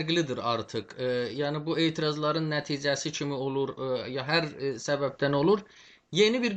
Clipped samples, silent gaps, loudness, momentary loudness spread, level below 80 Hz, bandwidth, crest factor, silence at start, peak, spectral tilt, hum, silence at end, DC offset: under 0.1%; none; -29 LUFS; 7 LU; -66 dBFS; 8.6 kHz; 18 dB; 0 s; -10 dBFS; -5 dB/octave; none; 0 s; under 0.1%